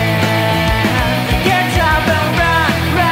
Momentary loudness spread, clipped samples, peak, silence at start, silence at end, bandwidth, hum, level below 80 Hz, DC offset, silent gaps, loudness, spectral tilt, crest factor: 2 LU; under 0.1%; -2 dBFS; 0 s; 0 s; 16.5 kHz; none; -26 dBFS; under 0.1%; none; -13 LUFS; -5 dB/octave; 12 dB